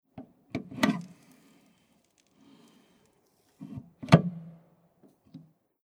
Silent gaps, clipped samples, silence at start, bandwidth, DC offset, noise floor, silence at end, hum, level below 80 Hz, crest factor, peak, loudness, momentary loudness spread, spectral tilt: none; under 0.1%; 0.15 s; 16 kHz; under 0.1%; -68 dBFS; 0.45 s; none; -64 dBFS; 32 dB; -2 dBFS; -27 LUFS; 28 LU; -7 dB/octave